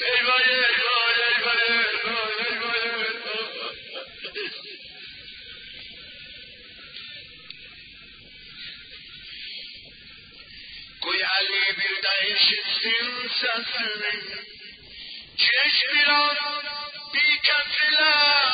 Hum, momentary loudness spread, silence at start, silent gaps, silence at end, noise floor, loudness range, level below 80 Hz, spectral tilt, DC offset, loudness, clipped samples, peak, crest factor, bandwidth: none; 22 LU; 0 s; none; 0 s; -46 dBFS; 19 LU; -64 dBFS; -5 dB/octave; under 0.1%; -21 LUFS; under 0.1%; -6 dBFS; 18 dB; 5.2 kHz